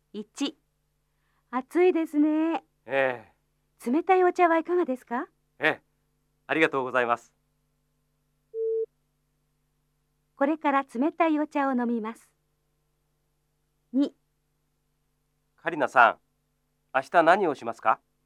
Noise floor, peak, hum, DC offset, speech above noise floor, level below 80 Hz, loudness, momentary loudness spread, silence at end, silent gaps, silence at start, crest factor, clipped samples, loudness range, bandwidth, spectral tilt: -74 dBFS; -4 dBFS; none; under 0.1%; 50 dB; -78 dBFS; -26 LUFS; 13 LU; 0.3 s; none; 0.15 s; 24 dB; under 0.1%; 9 LU; 13 kHz; -5 dB/octave